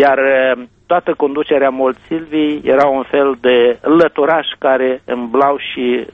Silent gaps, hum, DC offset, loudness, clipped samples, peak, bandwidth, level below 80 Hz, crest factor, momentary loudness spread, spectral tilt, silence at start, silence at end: none; none; under 0.1%; -14 LUFS; under 0.1%; 0 dBFS; 5.8 kHz; -54 dBFS; 14 dB; 6 LU; -7 dB/octave; 0 s; 0.1 s